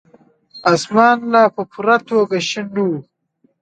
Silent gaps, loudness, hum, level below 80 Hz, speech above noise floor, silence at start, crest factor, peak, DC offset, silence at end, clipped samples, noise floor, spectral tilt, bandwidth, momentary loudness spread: none; -16 LUFS; none; -66 dBFS; 46 dB; 0.55 s; 16 dB; 0 dBFS; under 0.1%; 0.6 s; under 0.1%; -61 dBFS; -5 dB/octave; 9.2 kHz; 8 LU